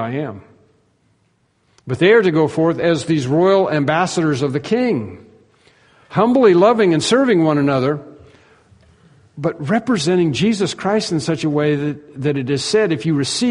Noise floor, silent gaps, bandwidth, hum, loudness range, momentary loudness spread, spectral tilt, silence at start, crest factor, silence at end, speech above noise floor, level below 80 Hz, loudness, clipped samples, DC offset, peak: -61 dBFS; none; 10.5 kHz; none; 4 LU; 11 LU; -5.5 dB/octave; 0 s; 16 dB; 0 s; 46 dB; -56 dBFS; -16 LUFS; under 0.1%; under 0.1%; 0 dBFS